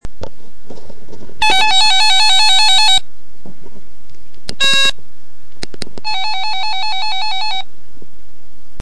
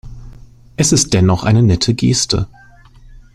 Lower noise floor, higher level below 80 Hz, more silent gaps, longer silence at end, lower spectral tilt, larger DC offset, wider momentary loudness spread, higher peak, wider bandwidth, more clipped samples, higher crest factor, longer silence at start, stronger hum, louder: first, -50 dBFS vs -41 dBFS; second, -42 dBFS vs -34 dBFS; neither; second, 0 s vs 0.9 s; second, 0 dB/octave vs -4.5 dB/octave; first, 20% vs under 0.1%; first, 24 LU vs 7 LU; about the same, 0 dBFS vs 0 dBFS; second, 11 kHz vs 15 kHz; neither; about the same, 14 dB vs 14 dB; about the same, 0 s vs 0.05 s; neither; about the same, -12 LUFS vs -13 LUFS